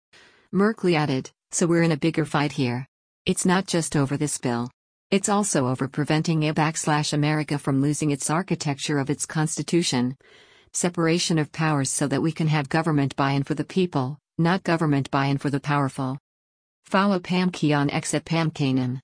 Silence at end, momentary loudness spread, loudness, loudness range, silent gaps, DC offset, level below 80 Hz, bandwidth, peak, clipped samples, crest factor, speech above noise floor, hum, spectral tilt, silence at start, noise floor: 0.05 s; 5 LU; -24 LUFS; 1 LU; 2.88-3.25 s, 4.74-5.10 s, 16.20-16.83 s; under 0.1%; -58 dBFS; 10.5 kHz; -8 dBFS; under 0.1%; 16 dB; over 67 dB; none; -5 dB/octave; 0.55 s; under -90 dBFS